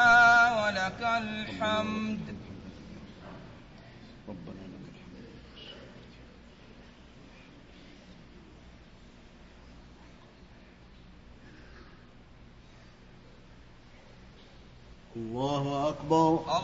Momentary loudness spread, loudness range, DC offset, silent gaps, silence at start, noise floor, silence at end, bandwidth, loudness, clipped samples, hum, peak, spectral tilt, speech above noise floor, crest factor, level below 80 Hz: 28 LU; 22 LU; under 0.1%; none; 0 s; -53 dBFS; 0 s; 7.6 kHz; -27 LUFS; under 0.1%; none; -10 dBFS; -3 dB/octave; 23 dB; 22 dB; -56 dBFS